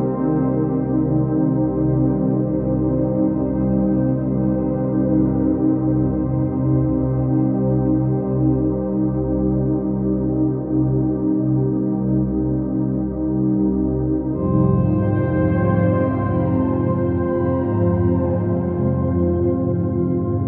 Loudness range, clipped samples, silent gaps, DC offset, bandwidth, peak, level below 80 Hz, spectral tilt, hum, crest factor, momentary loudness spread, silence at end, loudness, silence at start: 1 LU; under 0.1%; none; under 0.1%; 2.8 kHz; -6 dBFS; -34 dBFS; -12.5 dB/octave; none; 12 dB; 3 LU; 0 s; -19 LUFS; 0 s